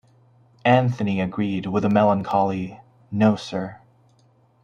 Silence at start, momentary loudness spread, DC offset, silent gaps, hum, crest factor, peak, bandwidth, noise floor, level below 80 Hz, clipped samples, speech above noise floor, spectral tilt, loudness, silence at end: 0.65 s; 12 LU; under 0.1%; none; none; 20 dB; -2 dBFS; 7.4 kHz; -59 dBFS; -60 dBFS; under 0.1%; 38 dB; -8 dB/octave; -22 LUFS; 0.85 s